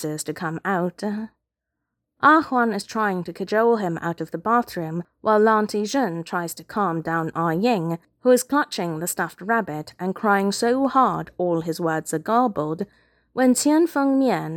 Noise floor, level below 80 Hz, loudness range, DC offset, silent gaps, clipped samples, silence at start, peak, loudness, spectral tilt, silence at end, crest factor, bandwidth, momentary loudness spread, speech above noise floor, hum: -82 dBFS; -64 dBFS; 1 LU; under 0.1%; none; under 0.1%; 0 s; -2 dBFS; -22 LUFS; -5 dB/octave; 0 s; 20 dB; 18 kHz; 11 LU; 60 dB; none